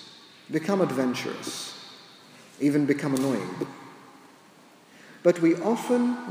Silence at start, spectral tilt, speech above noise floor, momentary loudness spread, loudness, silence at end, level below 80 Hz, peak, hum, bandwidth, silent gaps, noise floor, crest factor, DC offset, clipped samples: 0 s; -5.5 dB/octave; 29 dB; 22 LU; -26 LUFS; 0 s; -78 dBFS; -6 dBFS; none; 16 kHz; none; -54 dBFS; 20 dB; under 0.1%; under 0.1%